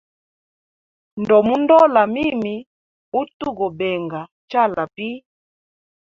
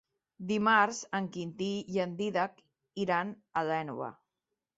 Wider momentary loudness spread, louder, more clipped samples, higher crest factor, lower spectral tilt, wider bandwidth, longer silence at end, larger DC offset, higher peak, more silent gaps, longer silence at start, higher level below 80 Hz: first, 17 LU vs 14 LU; first, -18 LUFS vs -32 LUFS; neither; about the same, 18 dB vs 20 dB; first, -7.5 dB/octave vs -3.5 dB/octave; second, 7 kHz vs 8 kHz; first, 0.9 s vs 0.65 s; neither; first, -2 dBFS vs -12 dBFS; first, 2.67-3.12 s, 3.34-3.40 s, 4.32-4.48 s vs none; first, 1.15 s vs 0.4 s; first, -58 dBFS vs -74 dBFS